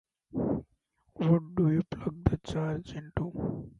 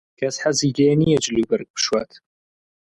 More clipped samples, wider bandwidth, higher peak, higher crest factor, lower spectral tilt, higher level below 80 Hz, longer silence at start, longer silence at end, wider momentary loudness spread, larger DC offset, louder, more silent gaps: neither; second, 7.6 kHz vs 11.5 kHz; about the same, -8 dBFS vs -6 dBFS; first, 22 dB vs 14 dB; first, -9 dB/octave vs -4.5 dB/octave; first, -46 dBFS vs -52 dBFS; first, 0.35 s vs 0.2 s; second, 0.1 s vs 0.85 s; about the same, 9 LU vs 8 LU; neither; second, -31 LUFS vs -20 LUFS; second, none vs 1.70-1.74 s